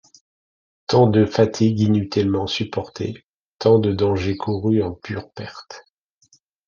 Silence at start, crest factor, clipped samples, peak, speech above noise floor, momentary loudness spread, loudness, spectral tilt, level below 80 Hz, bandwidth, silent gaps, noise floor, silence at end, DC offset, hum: 0.9 s; 18 dB; under 0.1%; -2 dBFS; over 71 dB; 19 LU; -20 LUFS; -7 dB/octave; -56 dBFS; 7.2 kHz; 3.24-3.56 s; under -90 dBFS; 0.9 s; under 0.1%; none